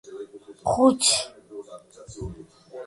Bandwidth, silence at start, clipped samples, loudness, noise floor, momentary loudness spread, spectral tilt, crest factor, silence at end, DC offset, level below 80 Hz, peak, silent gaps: 11.5 kHz; 0.05 s; under 0.1%; -21 LUFS; -45 dBFS; 26 LU; -3 dB/octave; 20 dB; 0 s; under 0.1%; -52 dBFS; -6 dBFS; none